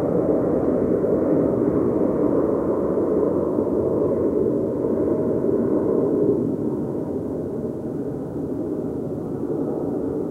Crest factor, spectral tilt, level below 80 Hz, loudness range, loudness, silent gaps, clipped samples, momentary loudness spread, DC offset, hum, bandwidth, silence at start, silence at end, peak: 14 dB; -11 dB/octave; -46 dBFS; 6 LU; -22 LUFS; none; under 0.1%; 8 LU; under 0.1%; none; 9 kHz; 0 s; 0 s; -6 dBFS